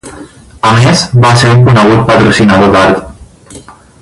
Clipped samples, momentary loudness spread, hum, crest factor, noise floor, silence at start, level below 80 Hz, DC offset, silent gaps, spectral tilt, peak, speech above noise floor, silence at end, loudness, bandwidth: 0.6%; 4 LU; none; 8 dB; -32 dBFS; 0.05 s; -32 dBFS; under 0.1%; none; -5.5 dB/octave; 0 dBFS; 26 dB; 0.3 s; -6 LUFS; 11.5 kHz